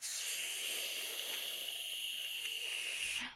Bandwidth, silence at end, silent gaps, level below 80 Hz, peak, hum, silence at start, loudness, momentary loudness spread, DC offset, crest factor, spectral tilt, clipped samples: 16 kHz; 0 s; none; -78 dBFS; -26 dBFS; none; 0 s; -38 LUFS; 2 LU; under 0.1%; 16 dB; 2.5 dB/octave; under 0.1%